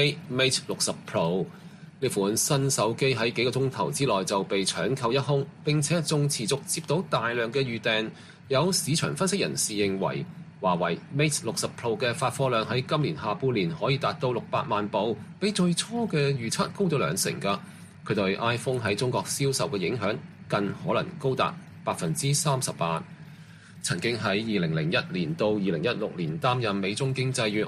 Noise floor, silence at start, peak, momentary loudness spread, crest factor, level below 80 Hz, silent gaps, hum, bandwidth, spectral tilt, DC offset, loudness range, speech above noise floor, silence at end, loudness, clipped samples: -47 dBFS; 0 s; -10 dBFS; 6 LU; 18 dB; -62 dBFS; none; none; 14.5 kHz; -4.5 dB/octave; under 0.1%; 2 LU; 21 dB; 0 s; -27 LUFS; under 0.1%